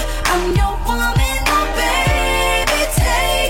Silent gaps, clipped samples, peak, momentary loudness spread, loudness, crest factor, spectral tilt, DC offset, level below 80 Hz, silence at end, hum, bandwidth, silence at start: none; under 0.1%; -2 dBFS; 3 LU; -16 LUFS; 12 dB; -3.5 dB/octave; under 0.1%; -20 dBFS; 0 s; none; 16.5 kHz; 0 s